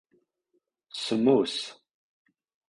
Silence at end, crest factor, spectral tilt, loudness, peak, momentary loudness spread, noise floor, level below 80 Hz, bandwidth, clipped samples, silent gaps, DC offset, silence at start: 0.95 s; 20 dB; -5 dB/octave; -26 LUFS; -10 dBFS; 17 LU; -76 dBFS; -70 dBFS; 11 kHz; under 0.1%; none; under 0.1%; 0.95 s